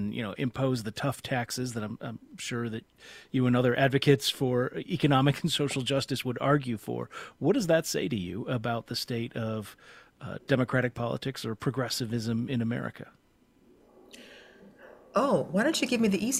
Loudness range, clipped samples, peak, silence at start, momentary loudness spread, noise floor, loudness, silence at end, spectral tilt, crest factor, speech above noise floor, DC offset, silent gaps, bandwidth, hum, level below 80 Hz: 7 LU; under 0.1%; -8 dBFS; 0 s; 15 LU; -64 dBFS; -29 LUFS; 0 s; -5 dB/octave; 22 dB; 35 dB; under 0.1%; none; 16 kHz; none; -62 dBFS